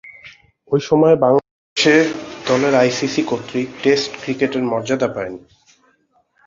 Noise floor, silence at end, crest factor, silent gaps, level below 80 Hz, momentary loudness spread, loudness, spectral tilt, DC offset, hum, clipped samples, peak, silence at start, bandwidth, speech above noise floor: -61 dBFS; 1.1 s; 16 dB; 1.51-1.76 s; -58 dBFS; 13 LU; -17 LUFS; -5 dB/octave; under 0.1%; none; under 0.1%; -2 dBFS; 0.05 s; 7.6 kHz; 44 dB